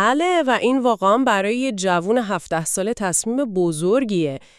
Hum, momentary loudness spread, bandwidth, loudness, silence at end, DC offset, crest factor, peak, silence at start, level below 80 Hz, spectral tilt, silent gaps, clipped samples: none; 5 LU; 12 kHz; -19 LUFS; 0.2 s; under 0.1%; 16 dB; -4 dBFS; 0 s; -56 dBFS; -4 dB/octave; none; under 0.1%